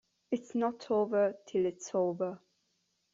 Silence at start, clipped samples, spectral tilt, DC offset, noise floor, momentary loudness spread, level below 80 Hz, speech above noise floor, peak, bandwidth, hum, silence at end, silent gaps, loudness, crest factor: 0.3 s; under 0.1%; -6 dB/octave; under 0.1%; -78 dBFS; 8 LU; -78 dBFS; 46 dB; -18 dBFS; 7.8 kHz; none; 0.75 s; none; -33 LUFS; 16 dB